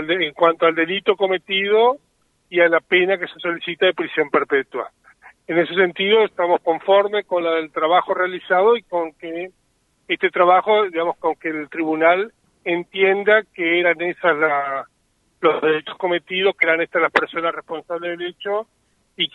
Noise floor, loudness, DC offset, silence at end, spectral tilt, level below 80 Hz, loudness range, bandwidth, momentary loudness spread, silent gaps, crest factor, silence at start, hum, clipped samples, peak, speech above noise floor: -64 dBFS; -19 LUFS; under 0.1%; 0.1 s; -6 dB/octave; -68 dBFS; 2 LU; 5.8 kHz; 11 LU; none; 20 dB; 0 s; none; under 0.1%; 0 dBFS; 45 dB